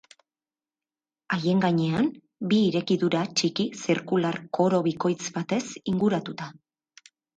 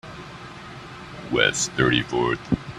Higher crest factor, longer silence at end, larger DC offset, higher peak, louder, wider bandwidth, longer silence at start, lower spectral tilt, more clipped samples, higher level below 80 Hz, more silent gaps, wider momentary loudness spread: second, 16 dB vs 22 dB; first, 0.85 s vs 0 s; neither; second, -10 dBFS vs -2 dBFS; second, -26 LUFS vs -22 LUFS; second, 9.2 kHz vs 13.5 kHz; first, 1.3 s vs 0.05 s; first, -5.5 dB/octave vs -3.5 dB/octave; neither; second, -66 dBFS vs -48 dBFS; neither; second, 7 LU vs 19 LU